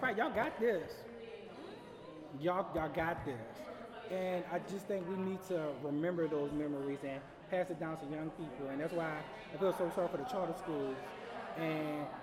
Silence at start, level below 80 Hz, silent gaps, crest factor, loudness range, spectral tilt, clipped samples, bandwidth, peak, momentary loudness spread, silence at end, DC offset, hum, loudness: 0 s; -66 dBFS; none; 18 dB; 2 LU; -6.5 dB/octave; under 0.1%; 16.5 kHz; -22 dBFS; 13 LU; 0 s; under 0.1%; none; -39 LUFS